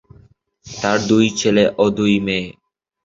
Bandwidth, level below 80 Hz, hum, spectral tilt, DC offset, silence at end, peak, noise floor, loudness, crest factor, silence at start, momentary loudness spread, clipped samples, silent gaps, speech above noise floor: 7.8 kHz; -50 dBFS; none; -5 dB/octave; under 0.1%; 0.55 s; -2 dBFS; -51 dBFS; -17 LUFS; 16 dB; 0.65 s; 9 LU; under 0.1%; none; 35 dB